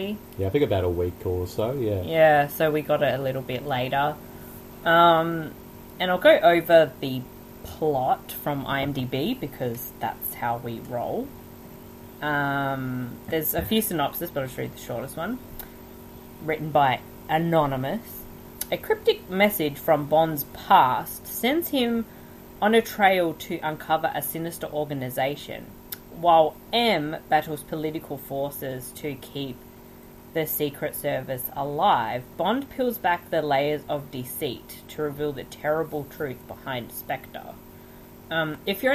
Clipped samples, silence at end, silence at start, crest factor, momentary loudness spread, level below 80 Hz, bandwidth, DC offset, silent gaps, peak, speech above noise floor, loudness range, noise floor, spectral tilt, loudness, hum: under 0.1%; 0 s; 0 s; 20 dB; 19 LU; -52 dBFS; 16 kHz; under 0.1%; none; -4 dBFS; 22 dB; 9 LU; -46 dBFS; -5 dB/octave; -25 LUFS; none